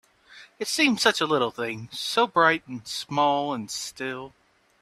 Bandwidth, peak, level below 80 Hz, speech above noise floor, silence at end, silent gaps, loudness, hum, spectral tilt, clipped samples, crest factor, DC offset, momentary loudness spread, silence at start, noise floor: 15 kHz; -4 dBFS; -68 dBFS; 26 dB; 0.55 s; none; -24 LUFS; none; -3 dB/octave; under 0.1%; 22 dB; under 0.1%; 13 LU; 0.3 s; -51 dBFS